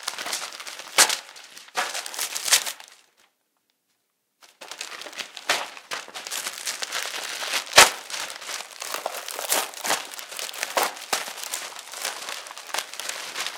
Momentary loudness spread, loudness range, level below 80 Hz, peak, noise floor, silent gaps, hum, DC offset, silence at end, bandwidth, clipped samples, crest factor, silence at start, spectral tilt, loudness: 16 LU; 10 LU; -66 dBFS; 0 dBFS; -74 dBFS; none; none; under 0.1%; 0 s; 19 kHz; under 0.1%; 28 dB; 0 s; 1.5 dB/octave; -25 LUFS